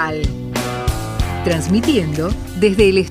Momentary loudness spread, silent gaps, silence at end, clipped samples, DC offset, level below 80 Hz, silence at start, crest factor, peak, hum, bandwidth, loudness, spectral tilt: 9 LU; none; 0 s; under 0.1%; under 0.1%; -26 dBFS; 0 s; 16 dB; -2 dBFS; none; 16 kHz; -18 LUFS; -6 dB/octave